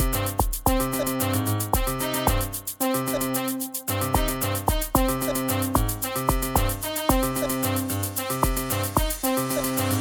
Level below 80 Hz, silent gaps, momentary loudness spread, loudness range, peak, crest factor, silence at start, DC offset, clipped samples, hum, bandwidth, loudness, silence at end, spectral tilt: -32 dBFS; none; 3 LU; 1 LU; -6 dBFS; 18 dB; 0 s; under 0.1%; under 0.1%; none; 19.5 kHz; -25 LUFS; 0 s; -4.5 dB/octave